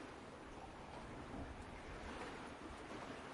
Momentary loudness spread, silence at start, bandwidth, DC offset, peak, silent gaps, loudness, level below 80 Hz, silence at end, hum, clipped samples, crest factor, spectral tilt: 4 LU; 0 s; 11.5 kHz; under 0.1%; -36 dBFS; none; -52 LUFS; -62 dBFS; 0 s; none; under 0.1%; 16 dB; -5 dB/octave